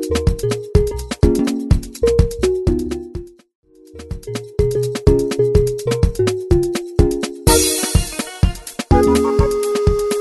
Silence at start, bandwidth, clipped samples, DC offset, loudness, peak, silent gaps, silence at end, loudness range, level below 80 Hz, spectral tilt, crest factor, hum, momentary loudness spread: 0 s; 12.5 kHz; under 0.1%; under 0.1%; -17 LUFS; -2 dBFS; 3.55-3.63 s; 0 s; 4 LU; -24 dBFS; -5.5 dB/octave; 16 dB; none; 11 LU